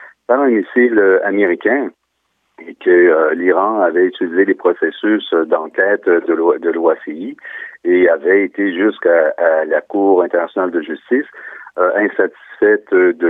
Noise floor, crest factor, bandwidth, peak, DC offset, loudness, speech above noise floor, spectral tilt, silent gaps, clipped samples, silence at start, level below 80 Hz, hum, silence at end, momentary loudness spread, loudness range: -67 dBFS; 12 dB; 3.9 kHz; -2 dBFS; under 0.1%; -14 LUFS; 53 dB; -8 dB/octave; none; under 0.1%; 0 s; -66 dBFS; none; 0 s; 9 LU; 2 LU